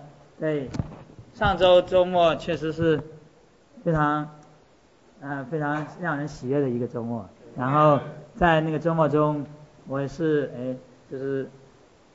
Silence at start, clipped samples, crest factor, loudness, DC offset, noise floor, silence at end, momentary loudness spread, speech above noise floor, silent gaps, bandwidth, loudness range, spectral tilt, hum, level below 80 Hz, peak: 0 s; under 0.1%; 20 dB; -24 LUFS; under 0.1%; -57 dBFS; 0.65 s; 16 LU; 34 dB; none; 8 kHz; 6 LU; -7.5 dB/octave; none; -48 dBFS; -6 dBFS